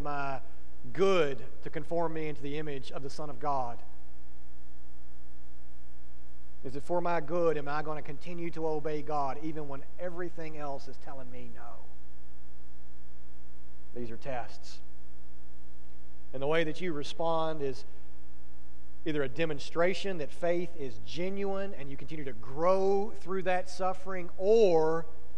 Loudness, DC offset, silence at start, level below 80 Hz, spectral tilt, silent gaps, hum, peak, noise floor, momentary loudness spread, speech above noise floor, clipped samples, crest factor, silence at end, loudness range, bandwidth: -33 LUFS; 6%; 0 s; -54 dBFS; -6 dB/octave; none; none; -12 dBFS; -54 dBFS; 19 LU; 21 dB; under 0.1%; 20 dB; 0 s; 13 LU; 11 kHz